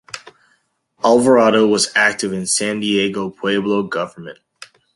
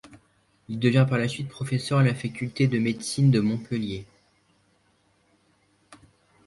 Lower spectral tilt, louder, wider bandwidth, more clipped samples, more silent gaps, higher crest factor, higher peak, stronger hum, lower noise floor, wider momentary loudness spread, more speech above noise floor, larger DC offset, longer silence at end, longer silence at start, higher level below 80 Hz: second, -3.5 dB/octave vs -6.5 dB/octave; first, -16 LUFS vs -25 LUFS; about the same, 11.5 kHz vs 11.5 kHz; neither; neither; about the same, 18 dB vs 18 dB; first, 0 dBFS vs -8 dBFS; neither; about the same, -63 dBFS vs -66 dBFS; first, 18 LU vs 11 LU; first, 47 dB vs 42 dB; neither; second, 0.3 s vs 0.5 s; about the same, 0.15 s vs 0.05 s; about the same, -58 dBFS vs -60 dBFS